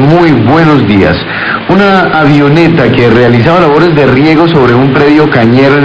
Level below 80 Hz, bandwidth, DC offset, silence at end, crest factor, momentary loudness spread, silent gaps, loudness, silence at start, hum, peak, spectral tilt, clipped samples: -30 dBFS; 8 kHz; 1%; 0 s; 4 dB; 2 LU; none; -5 LUFS; 0 s; none; 0 dBFS; -8 dB/octave; 9%